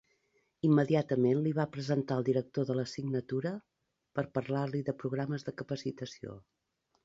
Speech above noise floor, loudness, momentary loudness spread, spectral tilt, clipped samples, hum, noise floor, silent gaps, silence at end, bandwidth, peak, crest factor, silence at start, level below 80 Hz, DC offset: 47 dB; -33 LUFS; 12 LU; -8 dB/octave; under 0.1%; none; -79 dBFS; none; 0.65 s; 7.8 kHz; -16 dBFS; 18 dB; 0.65 s; -70 dBFS; under 0.1%